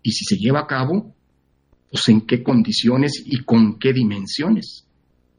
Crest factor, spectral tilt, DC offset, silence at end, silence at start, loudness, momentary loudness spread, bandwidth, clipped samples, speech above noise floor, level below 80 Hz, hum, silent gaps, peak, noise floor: 18 dB; -5.5 dB/octave; under 0.1%; 0.6 s; 0.05 s; -18 LUFS; 7 LU; 10 kHz; under 0.1%; 45 dB; -58 dBFS; none; none; -2 dBFS; -63 dBFS